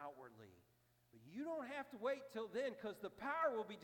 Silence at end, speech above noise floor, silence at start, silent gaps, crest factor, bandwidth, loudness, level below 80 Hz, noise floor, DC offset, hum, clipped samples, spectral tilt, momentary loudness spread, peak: 0 s; 32 dB; 0 s; none; 18 dB; 18 kHz; -45 LUFS; -86 dBFS; -77 dBFS; under 0.1%; 60 Hz at -80 dBFS; under 0.1%; -5 dB/octave; 19 LU; -28 dBFS